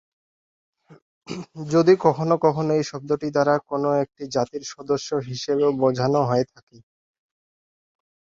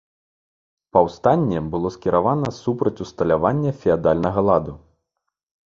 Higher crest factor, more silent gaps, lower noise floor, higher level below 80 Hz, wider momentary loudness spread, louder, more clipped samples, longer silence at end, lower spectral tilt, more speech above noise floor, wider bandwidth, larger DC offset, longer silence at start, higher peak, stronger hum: about the same, 20 dB vs 20 dB; first, 1.02-1.21 s vs none; first, under -90 dBFS vs -79 dBFS; second, -62 dBFS vs -46 dBFS; first, 12 LU vs 6 LU; about the same, -22 LUFS vs -20 LUFS; neither; first, 1.8 s vs 0.9 s; second, -6.5 dB/octave vs -8.5 dB/octave; first, over 68 dB vs 60 dB; about the same, 7.8 kHz vs 7.4 kHz; neither; about the same, 0.9 s vs 0.95 s; about the same, -2 dBFS vs 0 dBFS; neither